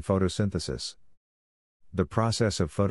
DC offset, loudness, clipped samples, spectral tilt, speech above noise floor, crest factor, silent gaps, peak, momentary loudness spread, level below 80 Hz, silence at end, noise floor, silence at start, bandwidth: 0.1%; -29 LUFS; under 0.1%; -5.5 dB/octave; over 63 dB; 20 dB; 1.17-1.80 s; -8 dBFS; 10 LU; -50 dBFS; 0 s; under -90 dBFS; 0 s; 11.5 kHz